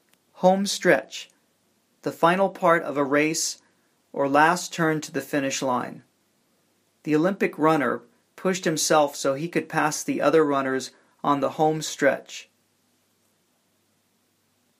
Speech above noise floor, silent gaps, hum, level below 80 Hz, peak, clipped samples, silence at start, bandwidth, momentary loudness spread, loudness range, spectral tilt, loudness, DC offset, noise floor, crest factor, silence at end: 45 dB; none; none; -76 dBFS; -4 dBFS; under 0.1%; 0.4 s; 15.5 kHz; 13 LU; 4 LU; -4 dB/octave; -23 LUFS; under 0.1%; -68 dBFS; 22 dB; 2.35 s